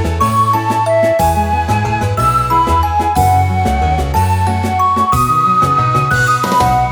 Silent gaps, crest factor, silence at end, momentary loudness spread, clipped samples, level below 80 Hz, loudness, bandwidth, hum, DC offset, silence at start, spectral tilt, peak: none; 12 dB; 0 s; 3 LU; under 0.1%; -26 dBFS; -13 LUFS; over 20 kHz; none; under 0.1%; 0 s; -6 dB/octave; 0 dBFS